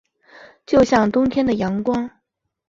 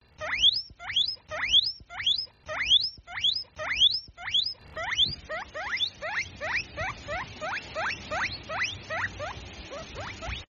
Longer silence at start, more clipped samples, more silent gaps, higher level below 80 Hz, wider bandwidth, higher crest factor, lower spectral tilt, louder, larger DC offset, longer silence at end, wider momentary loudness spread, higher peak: first, 0.7 s vs 0.2 s; neither; neither; first, -46 dBFS vs -52 dBFS; about the same, 7.8 kHz vs 7.2 kHz; about the same, 18 dB vs 18 dB; first, -6.5 dB/octave vs 1.5 dB/octave; first, -18 LUFS vs -27 LUFS; neither; first, 0.6 s vs 0.05 s; second, 9 LU vs 15 LU; first, -2 dBFS vs -12 dBFS